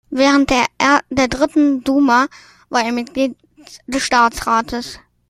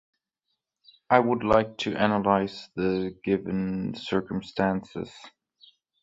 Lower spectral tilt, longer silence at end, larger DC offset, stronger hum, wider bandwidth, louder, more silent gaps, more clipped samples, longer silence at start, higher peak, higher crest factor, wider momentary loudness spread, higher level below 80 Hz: second, -3.5 dB/octave vs -7 dB/octave; second, 0.3 s vs 0.75 s; neither; neither; first, 14.5 kHz vs 7.8 kHz; first, -16 LUFS vs -26 LUFS; neither; neither; second, 0.1 s vs 1.1 s; about the same, 0 dBFS vs -2 dBFS; second, 16 dB vs 24 dB; about the same, 9 LU vs 10 LU; first, -42 dBFS vs -54 dBFS